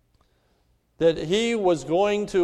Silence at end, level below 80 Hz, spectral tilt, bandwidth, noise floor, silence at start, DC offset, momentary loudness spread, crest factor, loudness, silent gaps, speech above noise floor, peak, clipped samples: 0 s; -54 dBFS; -5 dB/octave; 12 kHz; -66 dBFS; 1 s; under 0.1%; 2 LU; 16 dB; -23 LUFS; none; 44 dB; -8 dBFS; under 0.1%